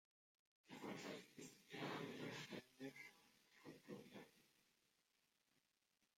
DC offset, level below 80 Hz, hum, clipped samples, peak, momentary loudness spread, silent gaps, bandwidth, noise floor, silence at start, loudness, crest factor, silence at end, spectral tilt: under 0.1%; under -90 dBFS; none; under 0.1%; -38 dBFS; 13 LU; none; 16 kHz; -87 dBFS; 0.65 s; -56 LUFS; 20 dB; 1.65 s; -4.5 dB/octave